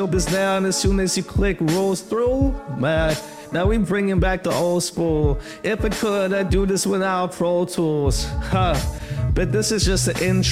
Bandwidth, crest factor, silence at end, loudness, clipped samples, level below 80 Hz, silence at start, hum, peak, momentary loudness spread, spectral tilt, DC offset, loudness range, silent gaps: 16 kHz; 14 dB; 0 s; -21 LUFS; under 0.1%; -28 dBFS; 0 s; none; -6 dBFS; 4 LU; -5 dB/octave; 0.1%; 1 LU; none